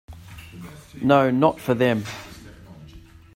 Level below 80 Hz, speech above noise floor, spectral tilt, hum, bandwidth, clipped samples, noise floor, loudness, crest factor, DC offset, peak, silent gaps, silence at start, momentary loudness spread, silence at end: -52 dBFS; 25 dB; -7 dB/octave; none; 16 kHz; under 0.1%; -46 dBFS; -20 LUFS; 20 dB; under 0.1%; -2 dBFS; none; 0.1 s; 24 LU; 0.35 s